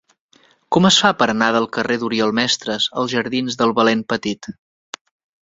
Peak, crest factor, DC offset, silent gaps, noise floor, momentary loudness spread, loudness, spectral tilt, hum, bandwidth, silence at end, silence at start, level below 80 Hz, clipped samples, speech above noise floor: 0 dBFS; 18 dB; under 0.1%; none; -56 dBFS; 21 LU; -17 LUFS; -3.5 dB/octave; none; 7.8 kHz; 0.9 s; 0.7 s; -58 dBFS; under 0.1%; 38 dB